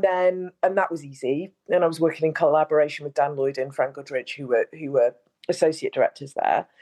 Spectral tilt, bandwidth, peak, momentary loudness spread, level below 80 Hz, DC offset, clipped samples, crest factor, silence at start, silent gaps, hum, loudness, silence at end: -5.5 dB/octave; 12 kHz; -6 dBFS; 8 LU; -78 dBFS; under 0.1%; under 0.1%; 16 dB; 0 s; none; none; -24 LUFS; 0.2 s